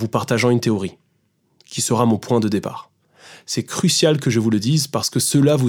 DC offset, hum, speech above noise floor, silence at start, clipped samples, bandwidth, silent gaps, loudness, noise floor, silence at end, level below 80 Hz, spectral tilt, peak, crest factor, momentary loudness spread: under 0.1%; none; 47 dB; 0 s; under 0.1%; 20 kHz; none; -18 LUFS; -65 dBFS; 0 s; -62 dBFS; -5 dB/octave; -2 dBFS; 16 dB; 10 LU